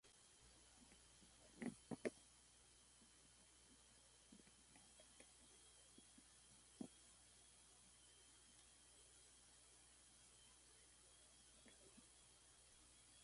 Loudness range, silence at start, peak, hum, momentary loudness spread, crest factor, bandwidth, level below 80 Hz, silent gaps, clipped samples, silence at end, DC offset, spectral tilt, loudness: 8 LU; 0.05 s; -32 dBFS; none; 13 LU; 32 dB; 11.5 kHz; -80 dBFS; none; under 0.1%; 0 s; under 0.1%; -3.5 dB/octave; -63 LUFS